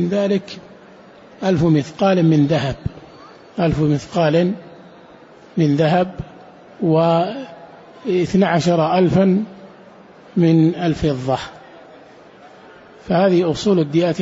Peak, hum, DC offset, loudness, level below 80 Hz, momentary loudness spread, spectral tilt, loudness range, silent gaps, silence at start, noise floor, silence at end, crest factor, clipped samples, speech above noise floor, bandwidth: -4 dBFS; none; under 0.1%; -17 LUFS; -46 dBFS; 16 LU; -7.5 dB/octave; 4 LU; none; 0 s; -44 dBFS; 0 s; 14 dB; under 0.1%; 27 dB; 8 kHz